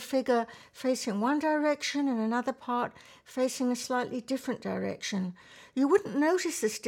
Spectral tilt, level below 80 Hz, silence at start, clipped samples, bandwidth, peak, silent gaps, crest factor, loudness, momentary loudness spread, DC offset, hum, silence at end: -4 dB/octave; -74 dBFS; 0 s; under 0.1%; 17.5 kHz; -12 dBFS; none; 18 dB; -30 LUFS; 9 LU; under 0.1%; none; 0 s